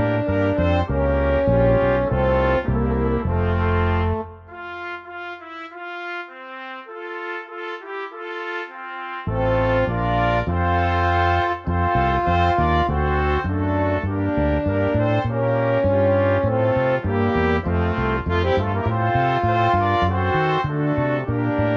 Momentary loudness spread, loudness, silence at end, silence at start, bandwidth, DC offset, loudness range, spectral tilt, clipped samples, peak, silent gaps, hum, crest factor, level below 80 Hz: 13 LU; -21 LUFS; 0 s; 0 s; 6.6 kHz; under 0.1%; 11 LU; -9 dB/octave; under 0.1%; -6 dBFS; none; none; 14 dB; -32 dBFS